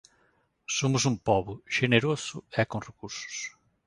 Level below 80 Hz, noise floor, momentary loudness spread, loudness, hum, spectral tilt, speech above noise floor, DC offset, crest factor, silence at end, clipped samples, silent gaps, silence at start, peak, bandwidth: -58 dBFS; -69 dBFS; 14 LU; -28 LUFS; none; -4.5 dB/octave; 41 dB; under 0.1%; 24 dB; 0.35 s; under 0.1%; none; 0.7 s; -6 dBFS; 11.5 kHz